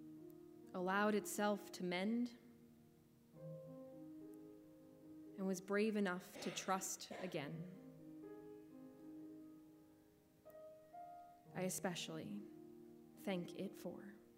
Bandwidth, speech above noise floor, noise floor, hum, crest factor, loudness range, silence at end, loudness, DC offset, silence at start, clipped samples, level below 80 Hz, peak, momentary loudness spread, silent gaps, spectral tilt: 16 kHz; 27 dB; -70 dBFS; none; 22 dB; 15 LU; 0 s; -45 LUFS; under 0.1%; 0 s; under 0.1%; -86 dBFS; -26 dBFS; 21 LU; none; -4.5 dB/octave